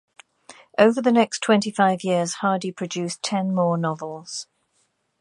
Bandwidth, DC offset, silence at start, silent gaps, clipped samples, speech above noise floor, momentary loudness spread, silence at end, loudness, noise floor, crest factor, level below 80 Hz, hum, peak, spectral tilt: 11.5 kHz; under 0.1%; 0.5 s; none; under 0.1%; 48 dB; 13 LU; 0.75 s; -22 LUFS; -69 dBFS; 22 dB; -72 dBFS; none; -2 dBFS; -5 dB/octave